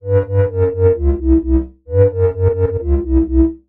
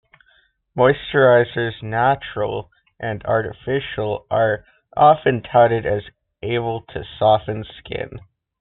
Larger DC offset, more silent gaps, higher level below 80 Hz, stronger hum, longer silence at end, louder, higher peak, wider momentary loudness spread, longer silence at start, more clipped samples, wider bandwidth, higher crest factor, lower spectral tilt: neither; neither; first, -22 dBFS vs -48 dBFS; neither; second, 0.1 s vs 0.4 s; first, -15 LUFS vs -19 LUFS; about the same, -2 dBFS vs -2 dBFS; second, 4 LU vs 16 LU; second, 0.05 s vs 0.75 s; neither; second, 3 kHz vs 4.2 kHz; second, 12 dB vs 18 dB; first, -13.5 dB/octave vs -4.5 dB/octave